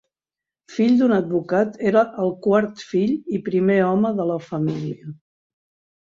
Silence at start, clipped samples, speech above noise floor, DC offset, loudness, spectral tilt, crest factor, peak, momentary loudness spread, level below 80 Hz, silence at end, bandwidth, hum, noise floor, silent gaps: 0.7 s; under 0.1%; 70 dB; under 0.1%; -20 LUFS; -8 dB/octave; 18 dB; -4 dBFS; 9 LU; -64 dBFS; 0.9 s; 7.4 kHz; none; -89 dBFS; none